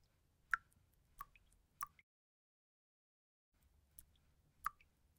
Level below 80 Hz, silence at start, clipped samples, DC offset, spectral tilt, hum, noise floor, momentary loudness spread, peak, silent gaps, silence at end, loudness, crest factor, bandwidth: -74 dBFS; 0.5 s; under 0.1%; under 0.1%; -1 dB/octave; none; -77 dBFS; 20 LU; -18 dBFS; 2.03-3.52 s; 0.5 s; -48 LUFS; 36 dB; 16 kHz